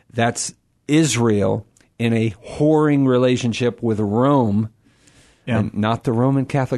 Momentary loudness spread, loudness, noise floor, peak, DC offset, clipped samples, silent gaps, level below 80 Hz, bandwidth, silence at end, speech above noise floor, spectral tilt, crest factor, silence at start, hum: 9 LU; -19 LUFS; -53 dBFS; -4 dBFS; under 0.1%; under 0.1%; none; -52 dBFS; 12.5 kHz; 0 s; 35 dB; -6 dB/octave; 14 dB; 0.15 s; none